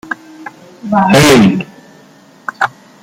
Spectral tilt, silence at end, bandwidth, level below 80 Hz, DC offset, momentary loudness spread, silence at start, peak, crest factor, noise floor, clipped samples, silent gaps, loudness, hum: -5 dB/octave; 0.35 s; 16.5 kHz; -40 dBFS; under 0.1%; 25 LU; 0.1 s; 0 dBFS; 14 dB; -42 dBFS; under 0.1%; none; -10 LUFS; none